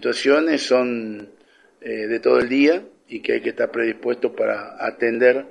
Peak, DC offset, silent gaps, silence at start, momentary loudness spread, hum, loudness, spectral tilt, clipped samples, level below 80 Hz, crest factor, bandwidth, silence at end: -2 dBFS; under 0.1%; none; 0 s; 12 LU; none; -20 LUFS; -4 dB/octave; under 0.1%; -62 dBFS; 18 dB; 10 kHz; 0 s